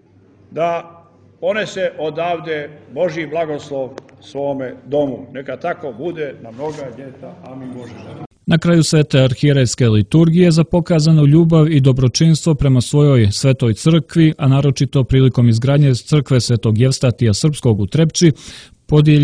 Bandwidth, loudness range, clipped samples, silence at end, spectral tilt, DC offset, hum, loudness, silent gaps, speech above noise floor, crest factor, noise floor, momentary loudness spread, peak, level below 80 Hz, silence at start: 10.5 kHz; 11 LU; under 0.1%; 0 s; -6.5 dB/octave; under 0.1%; none; -15 LUFS; 8.26-8.30 s; 34 dB; 14 dB; -48 dBFS; 17 LU; 0 dBFS; -40 dBFS; 0.5 s